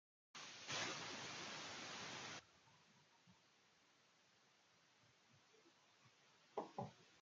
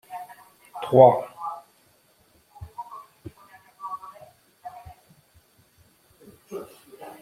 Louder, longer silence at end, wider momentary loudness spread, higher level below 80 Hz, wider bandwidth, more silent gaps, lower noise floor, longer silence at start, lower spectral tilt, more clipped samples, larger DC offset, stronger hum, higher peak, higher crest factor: second, -51 LUFS vs -21 LUFS; about the same, 0 s vs 0.1 s; second, 11 LU vs 30 LU; second, under -90 dBFS vs -64 dBFS; second, 9 kHz vs 15.5 kHz; neither; first, -76 dBFS vs -61 dBFS; first, 0.35 s vs 0.1 s; second, -2 dB/octave vs -8 dB/octave; neither; neither; neither; second, -32 dBFS vs -2 dBFS; about the same, 24 dB vs 26 dB